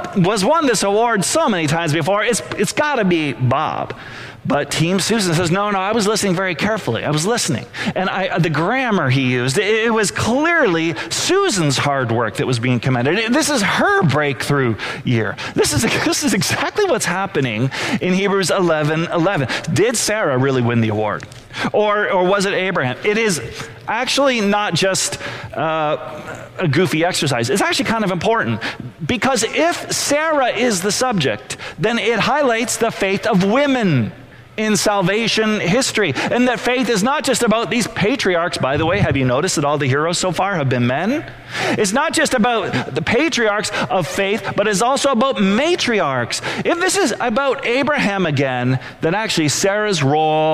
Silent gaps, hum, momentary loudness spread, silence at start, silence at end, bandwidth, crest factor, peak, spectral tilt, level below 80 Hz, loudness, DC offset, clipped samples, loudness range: none; none; 5 LU; 0 s; 0 s; 16 kHz; 12 dB; -6 dBFS; -4 dB/octave; -48 dBFS; -17 LUFS; under 0.1%; under 0.1%; 2 LU